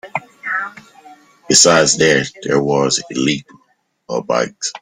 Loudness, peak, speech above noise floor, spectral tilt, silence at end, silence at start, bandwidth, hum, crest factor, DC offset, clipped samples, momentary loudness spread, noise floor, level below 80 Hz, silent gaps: -15 LUFS; 0 dBFS; 45 dB; -2.5 dB/octave; 0.05 s; 0.05 s; 16.5 kHz; none; 18 dB; under 0.1%; under 0.1%; 15 LU; -60 dBFS; -54 dBFS; none